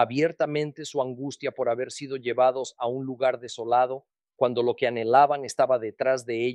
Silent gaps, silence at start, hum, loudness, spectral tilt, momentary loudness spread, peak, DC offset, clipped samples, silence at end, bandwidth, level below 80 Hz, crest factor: none; 0 s; none; -26 LUFS; -5 dB/octave; 10 LU; -6 dBFS; under 0.1%; under 0.1%; 0 s; 12 kHz; -76 dBFS; 20 dB